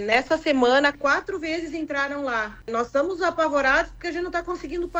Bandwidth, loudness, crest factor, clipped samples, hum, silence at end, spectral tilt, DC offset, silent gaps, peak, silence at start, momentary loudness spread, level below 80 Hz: 8.8 kHz; -23 LUFS; 16 dB; under 0.1%; none; 0 s; -3.5 dB/octave; under 0.1%; none; -6 dBFS; 0 s; 10 LU; -48 dBFS